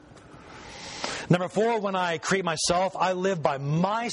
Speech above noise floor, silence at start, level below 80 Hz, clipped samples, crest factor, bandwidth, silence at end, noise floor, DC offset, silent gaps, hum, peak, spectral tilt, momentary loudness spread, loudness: 23 dB; 0.1 s; -58 dBFS; under 0.1%; 20 dB; 11 kHz; 0 s; -48 dBFS; under 0.1%; none; none; -6 dBFS; -4.5 dB/octave; 15 LU; -26 LUFS